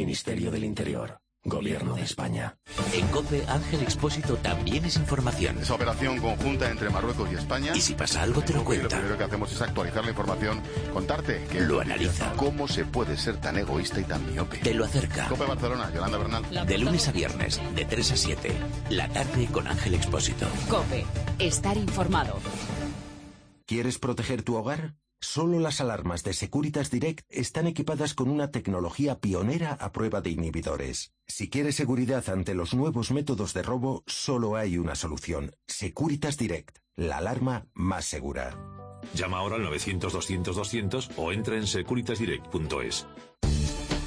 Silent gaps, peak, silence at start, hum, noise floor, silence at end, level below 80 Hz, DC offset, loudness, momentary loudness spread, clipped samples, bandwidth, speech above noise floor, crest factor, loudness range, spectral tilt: none; -12 dBFS; 0 s; none; -50 dBFS; 0 s; -40 dBFS; under 0.1%; -29 LUFS; 7 LU; under 0.1%; 10.5 kHz; 22 dB; 16 dB; 4 LU; -5 dB/octave